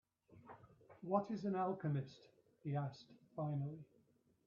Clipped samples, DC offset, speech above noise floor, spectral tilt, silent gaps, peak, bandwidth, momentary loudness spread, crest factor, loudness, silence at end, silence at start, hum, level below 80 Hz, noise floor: under 0.1%; under 0.1%; 33 dB; -8 dB/octave; none; -24 dBFS; 7 kHz; 21 LU; 20 dB; -43 LUFS; 0.65 s; 0.3 s; none; -82 dBFS; -75 dBFS